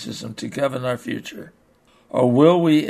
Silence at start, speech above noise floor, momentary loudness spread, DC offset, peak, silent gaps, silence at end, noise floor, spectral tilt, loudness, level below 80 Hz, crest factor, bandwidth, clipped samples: 0 s; 37 dB; 17 LU; under 0.1%; -2 dBFS; none; 0 s; -57 dBFS; -6.5 dB/octave; -20 LUFS; -64 dBFS; 18 dB; 13.5 kHz; under 0.1%